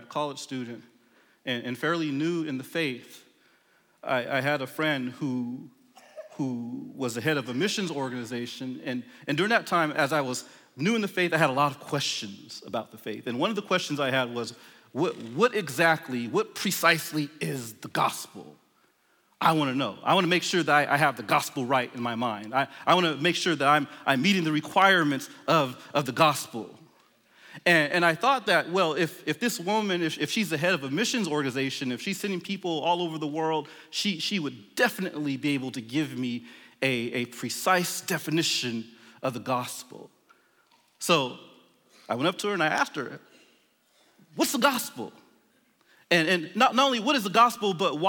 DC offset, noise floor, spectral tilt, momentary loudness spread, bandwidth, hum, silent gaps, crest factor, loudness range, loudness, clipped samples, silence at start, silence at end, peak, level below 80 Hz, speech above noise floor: under 0.1%; -67 dBFS; -4 dB/octave; 13 LU; 19.5 kHz; none; none; 20 dB; 7 LU; -26 LUFS; under 0.1%; 0 s; 0 s; -8 dBFS; -80 dBFS; 40 dB